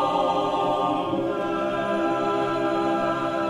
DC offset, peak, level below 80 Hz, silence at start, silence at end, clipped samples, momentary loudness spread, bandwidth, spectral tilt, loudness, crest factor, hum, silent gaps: under 0.1%; -12 dBFS; -58 dBFS; 0 s; 0 s; under 0.1%; 3 LU; 12 kHz; -6 dB/octave; -24 LUFS; 12 dB; none; none